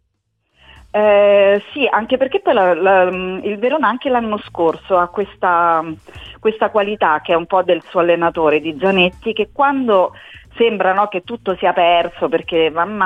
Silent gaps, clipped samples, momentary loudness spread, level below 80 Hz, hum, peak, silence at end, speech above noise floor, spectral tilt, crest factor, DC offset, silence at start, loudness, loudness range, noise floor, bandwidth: none; under 0.1%; 8 LU; -50 dBFS; none; -2 dBFS; 0 s; 53 dB; -7 dB/octave; 14 dB; under 0.1%; 0.95 s; -15 LUFS; 3 LU; -68 dBFS; 4.8 kHz